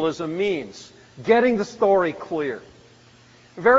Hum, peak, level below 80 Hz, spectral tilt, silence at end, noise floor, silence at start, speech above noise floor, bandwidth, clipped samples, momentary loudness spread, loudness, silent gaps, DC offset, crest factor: none; -4 dBFS; -60 dBFS; -4 dB/octave; 0 s; -51 dBFS; 0 s; 30 dB; 7.8 kHz; under 0.1%; 16 LU; -22 LUFS; none; under 0.1%; 18 dB